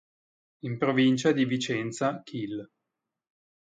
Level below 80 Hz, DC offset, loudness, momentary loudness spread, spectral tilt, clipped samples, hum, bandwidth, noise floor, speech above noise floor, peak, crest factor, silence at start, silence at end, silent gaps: -72 dBFS; under 0.1%; -27 LUFS; 14 LU; -5.5 dB/octave; under 0.1%; none; 9.4 kHz; -86 dBFS; 59 dB; -10 dBFS; 18 dB; 0.65 s; 1.15 s; none